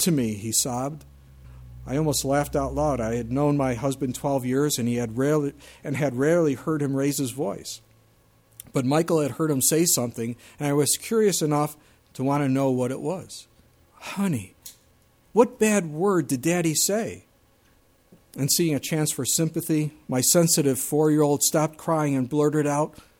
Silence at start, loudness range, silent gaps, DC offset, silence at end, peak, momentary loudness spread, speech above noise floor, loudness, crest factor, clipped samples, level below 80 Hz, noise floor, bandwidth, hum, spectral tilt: 0 s; 5 LU; none; under 0.1%; 0.3 s; -4 dBFS; 12 LU; 36 dB; -24 LUFS; 20 dB; under 0.1%; -50 dBFS; -60 dBFS; 18 kHz; none; -4.5 dB/octave